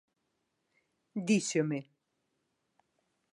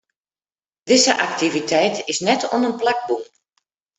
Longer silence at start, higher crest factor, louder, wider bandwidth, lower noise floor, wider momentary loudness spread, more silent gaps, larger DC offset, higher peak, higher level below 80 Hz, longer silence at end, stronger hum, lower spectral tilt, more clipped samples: first, 1.15 s vs 0.85 s; about the same, 20 dB vs 20 dB; second, -32 LUFS vs -18 LUFS; first, 11.5 kHz vs 8.4 kHz; second, -81 dBFS vs under -90 dBFS; first, 11 LU vs 8 LU; neither; neither; second, -16 dBFS vs -2 dBFS; second, -84 dBFS vs -66 dBFS; first, 1.5 s vs 0.75 s; neither; first, -5 dB/octave vs -2.5 dB/octave; neither